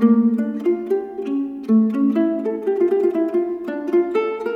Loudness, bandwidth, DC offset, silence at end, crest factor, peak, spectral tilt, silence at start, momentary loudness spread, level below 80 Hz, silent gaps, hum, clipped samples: -20 LUFS; 5 kHz; under 0.1%; 0 s; 14 dB; -4 dBFS; -9 dB/octave; 0 s; 7 LU; -66 dBFS; none; none; under 0.1%